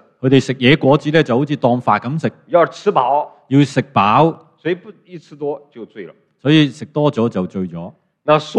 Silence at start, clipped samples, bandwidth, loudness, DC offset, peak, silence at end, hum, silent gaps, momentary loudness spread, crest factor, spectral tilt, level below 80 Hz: 0.25 s; under 0.1%; 9.4 kHz; -16 LUFS; under 0.1%; 0 dBFS; 0 s; none; none; 14 LU; 16 dB; -7 dB/octave; -54 dBFS